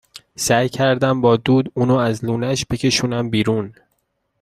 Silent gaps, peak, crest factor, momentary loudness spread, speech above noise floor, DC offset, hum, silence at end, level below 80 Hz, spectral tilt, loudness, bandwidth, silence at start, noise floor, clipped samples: none; -2 dBFS; 16 dB; 7 LU; 52 dB; under 0.1%; none; 0.7 s; -48 dBFS; -5 dB/octave; -18 LUFS; 15 kHz; 0.15 s; -69 dBFS; under 0.1%